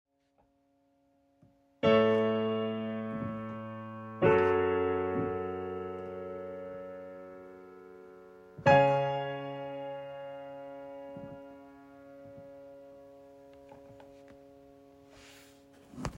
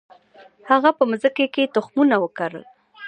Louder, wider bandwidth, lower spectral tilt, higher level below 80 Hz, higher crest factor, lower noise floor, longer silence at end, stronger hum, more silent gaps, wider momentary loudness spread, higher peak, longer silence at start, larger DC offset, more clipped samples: second, -31 LUFS vs -20 LUFS; about the same, 8.6 kHz vs 9.2 kHz; about the same, -7 dB/octave vs -6 dB/octave; first, -64 dBFS vs -74 dBFS; about the same, 22 dB vs 18 dB; first, -72 dBFS vs -50 dBFS; about the same, 0 s vs 0 s; neither; neither; first, 27 LU vs 11 LU; second, -10 dBFS vs -2 dBFS; first, 1.85 s vs 0.65 s; neither; neither